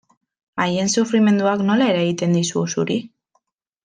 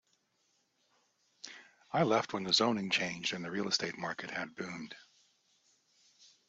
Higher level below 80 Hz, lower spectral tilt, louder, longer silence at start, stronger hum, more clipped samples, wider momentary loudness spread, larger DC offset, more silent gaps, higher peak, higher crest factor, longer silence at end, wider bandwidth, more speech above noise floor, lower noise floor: first, -64 dBFS vs -78 dBFS; first, -5 dB/octave vs -3.5 dB/octave; first, -19 LUFS vs -33 LUFS; second, 0.55 s vs 1.45 s; neither; neither; second, 7 LU vs 21 LU; neither; neither; first, -4 dBFS vs -14 dBFS; second, 16 dB vs 22 dB; second, 0.8 s vs 1.5 s; first, 9.6 kHz vs 8 kHz; first, 50 dB vs 42 dB; second, -68 dBFS vs -77 dBFS